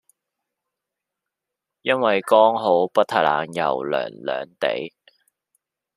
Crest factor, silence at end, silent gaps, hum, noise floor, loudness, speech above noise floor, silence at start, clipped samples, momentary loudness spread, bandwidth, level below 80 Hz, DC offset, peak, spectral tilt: 20 dB; 1.1 s; none; none; -85 dBFS; -21 LUFS; 65 dB; 1.85 s; under 0.1%; 12 LU; 14.5 kHz; -72 dBFS; under 0.1%; -2 dBFS; -5 dB/octave